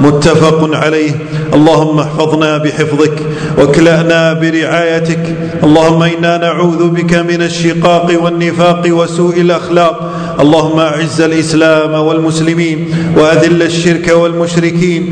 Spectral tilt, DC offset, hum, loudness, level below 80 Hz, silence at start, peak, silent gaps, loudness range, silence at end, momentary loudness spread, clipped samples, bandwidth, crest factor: -6 dB/octave; under 0.1%; none; -9 LUFS; -38 dBFS; 0 s; 0 dBFS; none; 1 LU; 0 s; 5 LU; 2%; 11 kHz; 8 dB